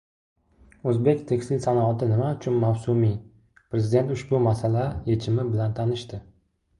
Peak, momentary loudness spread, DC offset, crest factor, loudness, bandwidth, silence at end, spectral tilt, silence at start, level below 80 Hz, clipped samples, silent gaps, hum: -8 dBFS; 7 LU; under 0.1%; 16 dB; -24 LUFS; 11 kHz; 0.55 s; -8.5 dB/octave; 0.85 s; -50 dBFS; under 0.1%; none; none